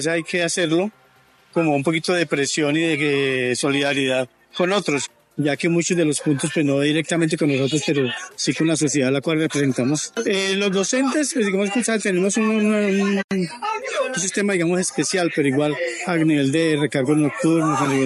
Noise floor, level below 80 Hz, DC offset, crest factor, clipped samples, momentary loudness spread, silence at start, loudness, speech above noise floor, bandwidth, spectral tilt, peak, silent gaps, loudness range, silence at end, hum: -55 dBFS; -66 dBFS; under 0.1%; 14 dB; under 0.1%; 5 LU; 0 s; -20 LUFS; 35 dB; 12 kHz; -4.5 dB/octave; -6 dBFS; 13.24-13.29 s; 1 LU; 0 s; none